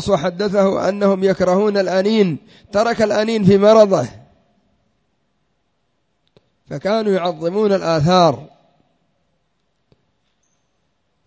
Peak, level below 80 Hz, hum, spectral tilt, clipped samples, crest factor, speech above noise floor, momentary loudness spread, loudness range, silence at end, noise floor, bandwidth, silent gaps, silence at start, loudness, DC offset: 0 dBFS; -50 dBFS; none; -6.5 dB/octave; under 0.1%; 18 dB; 53 dB; 8 LU; 9 LU; 2.8 s; -69 dBFS; 8 kHz; none; 0 s; -16 LUFS; under 0.1%